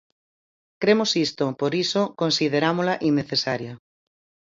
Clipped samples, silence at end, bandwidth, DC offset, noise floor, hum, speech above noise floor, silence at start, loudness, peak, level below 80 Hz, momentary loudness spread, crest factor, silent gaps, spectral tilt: under 0.1%; 0.75 s; 7.8 kHz; under 0.1%; under -90 dBFS; none; over 68 dB; 0.8 s; -22 LUFS; -4 dBFS; -66 dBFS; 5 LU; 20 dB; none; -4.5 dB/octave